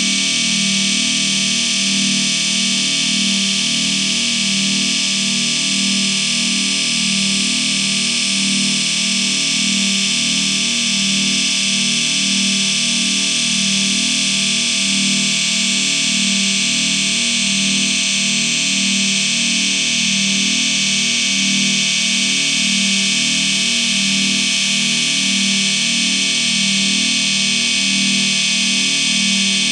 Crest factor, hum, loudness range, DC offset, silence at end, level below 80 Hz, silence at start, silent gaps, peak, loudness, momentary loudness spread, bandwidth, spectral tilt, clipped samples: 14 dB; none; 1 LU; under 0.1%; 0 s; -56 dBFS; 0 s; none; -2 dBFS; -14 LUFS; 1 LU; 15.5 kHz; -0.5 dB/octave; under 0.1%